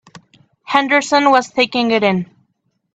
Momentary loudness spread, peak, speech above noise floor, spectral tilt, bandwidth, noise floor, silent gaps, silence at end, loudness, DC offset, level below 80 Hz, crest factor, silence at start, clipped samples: 6 LU; 0 dBFS; 53 dB; -4 dB/octave; 8.6 kHz; -67 dBFS; none; 0.7 s; -15 LUFS; under 0.1%; -60 dBFS; 16 dB; 0.15 s; under 0.1%